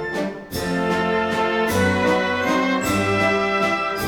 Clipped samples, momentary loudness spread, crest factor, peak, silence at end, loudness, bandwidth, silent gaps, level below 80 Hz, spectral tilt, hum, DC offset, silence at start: under 0.1%; 7 LU; 14 dB; -6 dBFS; 0 s; -20 LUFS; over 20 kHz; none; -46 dBFS; -5 dB/octave; none; 0.1%; 0 s